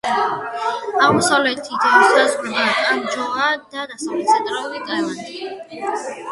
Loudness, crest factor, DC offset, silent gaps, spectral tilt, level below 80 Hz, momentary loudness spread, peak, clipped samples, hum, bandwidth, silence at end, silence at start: -18 LUFS; 18 dB; under 0.1%; none; -3 dB/octave; -62 dBFS; 14 LU; 0 dBFS; under 0.1%; none; 11.5 kHz; 0 s; 0.05 s